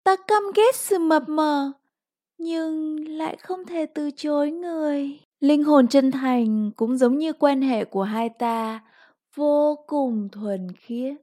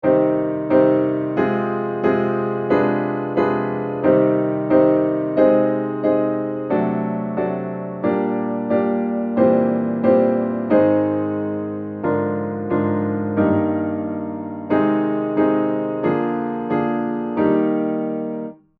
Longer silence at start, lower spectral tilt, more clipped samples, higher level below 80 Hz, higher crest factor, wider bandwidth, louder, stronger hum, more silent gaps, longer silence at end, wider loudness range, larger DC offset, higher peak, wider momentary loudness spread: about the same, 0.05 s vs 0.05 s; second, -5 dB/octave vs -11 dB/octave; neither; second, -82 dBFS vs -60 dBFS; about the same, 18 dB vs 16 dB; first, 16 kHz vs 4.6 kHz; second, -23 LUFS vs -20 LUFS; neither; first, 5.25-5.32 s vs none; second, 0.05 s vs 0.25 s; first, 7 LU vs 3 LU; neither; about the same, -4 dBFS vs -2 dBFS; first, 11 LU vs 8 LU